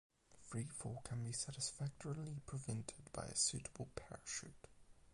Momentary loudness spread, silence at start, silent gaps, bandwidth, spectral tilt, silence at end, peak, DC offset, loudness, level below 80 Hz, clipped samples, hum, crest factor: 13 LU; 0.3 s; none; 11.5 kHz; -3.5 dB/octave; 0 s; -26 dBFS; under 0.1%; -45 LUFS; -66 dBFS; under 0.1%; none; 22 dB